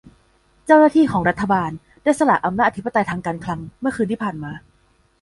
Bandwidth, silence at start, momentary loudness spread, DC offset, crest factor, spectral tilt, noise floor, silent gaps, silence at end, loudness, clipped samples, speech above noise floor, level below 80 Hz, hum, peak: 11.5 kHz; 0.65 s; 15 LU; under 0.1%; 18 dB; -6.5 dB/octave; -59 dBFS; none; 0.65 s; -19 LUFS; under 0.1%; 41 dB; -50 dBFS; none; -2 dBFS